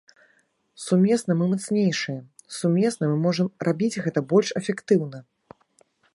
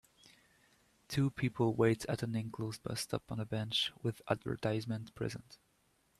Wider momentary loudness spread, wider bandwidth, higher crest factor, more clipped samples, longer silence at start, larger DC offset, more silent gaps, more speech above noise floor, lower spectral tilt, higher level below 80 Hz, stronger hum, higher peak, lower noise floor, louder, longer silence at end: about the same, 12 LU vs 10 LU; second, 11.5 kHz vs 14 kHz; about the same, 18 dB vs 22 dB; neither; second, 0.8 s vs 1.1 s; neither; neither; first, 43 dB vs 38 dB; about the same, -6 dB/octave vs -5.5 dB/octave; about the same, -70 dBFS vs -66 dBFS; neither; first, -6 dBFS vs -16 dBFS; second, -65 dBFS vs -74 dBFS; first, -23 LUFS vs -37 LUFS; first, 0.95 s vs 0.65 s